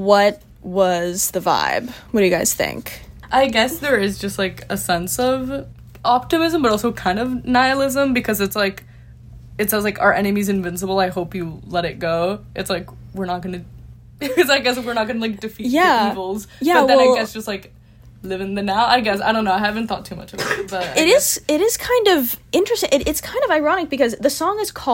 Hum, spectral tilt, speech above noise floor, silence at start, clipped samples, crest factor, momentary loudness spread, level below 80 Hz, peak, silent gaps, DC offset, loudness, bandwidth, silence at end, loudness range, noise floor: none; -3.5 dB/octave; 22 dB; 0 s; under 0.1%; 18 dB; 12 LU; -44 dBFS; 0 dBFS; none; under 0.1%; -18 LUFS; 16.5 kHz; 0 s; 4 LU; -40 dBFS